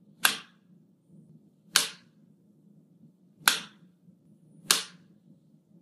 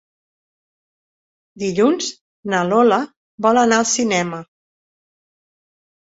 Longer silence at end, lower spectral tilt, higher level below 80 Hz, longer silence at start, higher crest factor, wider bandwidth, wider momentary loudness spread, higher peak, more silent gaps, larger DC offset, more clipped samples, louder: second, 0.95 s vs 1.7 s; second, 1 dB/octave vs -3.5 dB/octave; second, -82 dBFS vs -64 dBFS; second, 0.2 s vs 1.55 s; first, 34 dB vs 18 dB; first, 15.5 kHz vs 8 kHz; about the same, 13 LU vs 12 LU; about the same, 0 dBFS vs -2 dBFS; second, none vs 2.21-2.43 s, 3.16-3.38 s; neither; neither; second, -27 LUFS vs -17 LUFS